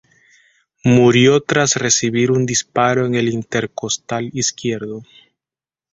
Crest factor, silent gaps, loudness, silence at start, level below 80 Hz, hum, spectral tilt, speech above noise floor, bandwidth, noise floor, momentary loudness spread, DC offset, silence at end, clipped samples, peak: 16 dB; none; -16 LUFS; 0.85 s; -54 dBFS; none; -4 dB/octave; over 74 dB; 8 kHz; under -90 dBFS; 11 LU; under 0.1%; 0.9 s; under 0.1%; -2 dBFS